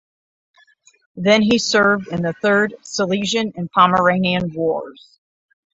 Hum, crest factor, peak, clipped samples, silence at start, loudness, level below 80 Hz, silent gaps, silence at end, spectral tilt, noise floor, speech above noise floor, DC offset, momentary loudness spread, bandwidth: none; 18 dB; -2 dBFS; under 0.1%; 1.15 s; -17 LUFS; -56 dBFS; none; 0.85 s; -4.5 dB/octave; -54 dBFS; 37 dB; under 0.1%; 8 LU; 8 kHz